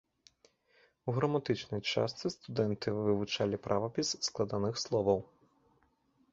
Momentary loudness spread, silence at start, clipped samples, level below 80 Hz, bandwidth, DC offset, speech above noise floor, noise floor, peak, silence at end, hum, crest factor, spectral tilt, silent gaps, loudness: 4 LU; 1.05 s; under 0.1%; -64 dBFS; 8 kHz; under 0.1%; 39 dB; -72 dBFS; -14 dBFS; 1.05 s; none; 22 dB; -5 dB/octave; none; -34 LUFS